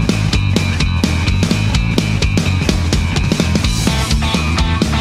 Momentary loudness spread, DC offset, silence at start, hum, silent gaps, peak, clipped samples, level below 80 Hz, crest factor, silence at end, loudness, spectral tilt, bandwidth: 1 LU; under 0.1%; 0 s; none; none; 0 dBFS; under 0.1%; -20 dBFS; 14 dB; 0 s; -15 LUFS; -5 dB/octave; 15 kHz